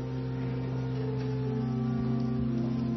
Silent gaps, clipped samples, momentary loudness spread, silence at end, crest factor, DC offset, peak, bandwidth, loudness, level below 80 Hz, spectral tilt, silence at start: none; under 0.1%; 3 LU; 0 s; 10 dB; under 0.1%; -20 dBFS; 6 kHz; -32 LUFS; -48 dBFS; -9.5 dB/octave; 0 s